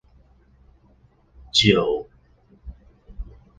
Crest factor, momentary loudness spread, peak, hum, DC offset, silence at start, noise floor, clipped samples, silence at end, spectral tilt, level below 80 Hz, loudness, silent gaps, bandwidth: 24 dB; 28 LU; -2 dBFS; none; under 0.1%; 1.55 s; -57 dBFS; under 0.1%; 0.3 s; -4.5 dB/octave; -44 dBFS; -19 LUFS; none; 10 kHz